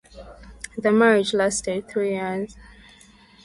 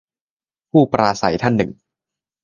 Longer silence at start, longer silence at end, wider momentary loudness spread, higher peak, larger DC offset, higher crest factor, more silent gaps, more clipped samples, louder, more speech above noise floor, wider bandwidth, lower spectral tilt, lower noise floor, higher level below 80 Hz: second, 0.15 s vs 0.75 s; about the same, 0.8 s vs 0.7 s; first, 18 LU vs 5 LU; second, -6 dBFS vs 0 dBFS; neither; about the same, 18 dB vs 20 dB; neither; neither; second, -22 LUFS vs -17 LUFS; second, 30 dB vs over 74 dB; first, 11.5 kHz vs 7.4 kHz; second, -4 dB/octave vs -6.5 dB/octave; second, -51 dBFS vs under -90 dBFS; about the same, -52 dBFS vs -50 dBFS